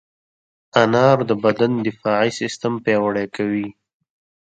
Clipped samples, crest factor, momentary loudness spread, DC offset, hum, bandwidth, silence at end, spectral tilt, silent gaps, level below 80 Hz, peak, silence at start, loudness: under 0.1%; 20 dB; 8 LU; under 0.1%; none; 9.2 kHz; 0.8 s; -6 dB/octave; none; -62 dBFS; 0 dBFS; 0.75 s; -19 LUFS